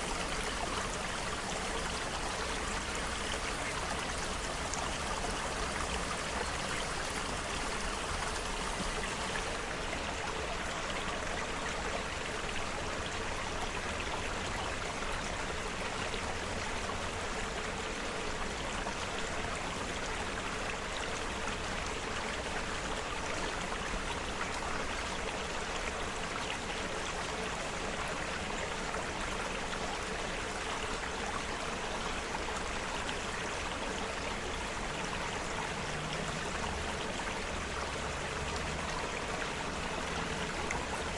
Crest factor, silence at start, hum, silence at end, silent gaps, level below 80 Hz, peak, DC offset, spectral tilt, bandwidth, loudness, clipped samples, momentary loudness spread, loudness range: 20 dB; 0 s; none; 0 s; none; -46 dBFS; -16 dBFS; under 0.1%; -3 dB/octave; 11.5 kHz; -36 LUFS; under 0.1%; 2 LU; 1 LU